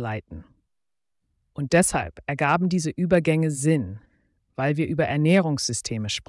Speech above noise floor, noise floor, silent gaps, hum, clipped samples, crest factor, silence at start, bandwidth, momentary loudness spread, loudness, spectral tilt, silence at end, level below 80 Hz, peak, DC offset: 65 dB; -88 dBFS; none; none; under 0.1%; 16 dB; 0 s; 12 kHz; 17 LU; -23 LUFS; -5 dB/octave; 0.05 s; -52 dBFS; -8 dBFS; under 0.1%